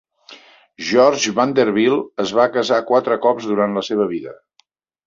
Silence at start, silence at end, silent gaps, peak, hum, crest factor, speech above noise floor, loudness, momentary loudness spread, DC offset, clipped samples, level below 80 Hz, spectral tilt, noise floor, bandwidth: 0.3 s; 0.7 s; none; -2 dBFS; none; 16 dB; 44 dB; -17 LUFS; 7 LU; under 0.1%; under 0.1%; -62 dBFS; -4 dB/octave; -61 dBFS; 7.6 kHz